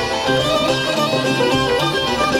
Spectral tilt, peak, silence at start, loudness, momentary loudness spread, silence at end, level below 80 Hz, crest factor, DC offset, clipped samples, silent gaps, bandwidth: -4 dB/octave; -4 dBFS; 0 s; -17 LUFS; 1 LU; 0 s; -42 dBFS; 14 dB; under 0.1%; under 0.1%; none; 17 kHz